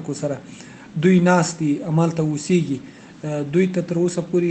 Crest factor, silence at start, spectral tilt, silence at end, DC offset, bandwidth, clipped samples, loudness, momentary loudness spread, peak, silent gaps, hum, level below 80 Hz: 18 dB; 0 s; -6.5 dB/octave; 0 s; under 0.1%; 9 kHz; under 0.1%; -20 LUFS; 16 LU; -2 dBFS; none; none; -60 dBFS